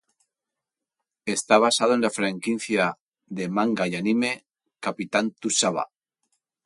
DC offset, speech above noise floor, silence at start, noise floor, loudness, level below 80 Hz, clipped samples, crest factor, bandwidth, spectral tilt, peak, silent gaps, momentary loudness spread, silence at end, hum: under 0.1%; 64 dB; 1.25 s; -87 dBFS; -24 LUFS; -70 dBFS; under 0.1%; 22 dB; 11.5 kHz; -3.5 dB/octave; -4 dBFS; 3.00-3.12 s; 13 LU; 0.8 s; none